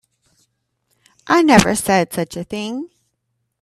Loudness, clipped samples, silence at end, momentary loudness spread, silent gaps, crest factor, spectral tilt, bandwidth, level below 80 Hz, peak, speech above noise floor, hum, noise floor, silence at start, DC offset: -16 LUFS; under 0.1%; 0.75 s; 16 LU; none; 20 dB; -4.5 dB/octave; 14 kHz; -46 dBFS; 0 dBFS; 57 dB; none; -72 dBFS; 1.25 s; under 0.1%